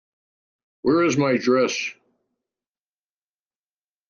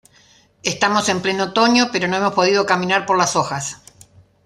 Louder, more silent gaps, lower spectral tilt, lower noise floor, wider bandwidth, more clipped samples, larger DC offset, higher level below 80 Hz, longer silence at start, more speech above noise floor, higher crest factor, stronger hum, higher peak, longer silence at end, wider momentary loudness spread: second, -21 LUFS vs -17 LUFS; neither; first, -5 dB/octave vs -3.5 dB/octave; first, under -90 dBFS vs -53 dBFS; second, 7.4 kHz vs 13.5 kHz; neither; neither; second, -66 dBFS vs -60 dBFS; first, 0.85 s vs 0.65 s; first, over 70 dB vs 35 dB; about the same, 18 dB vs 18 dB; first, 50 Hz at -65 dBFS vs none; second, -8 dBFS vs -2 dBFS; first, 2.15 s vs 0.7 s; about the same, 8 LU vs 10 LU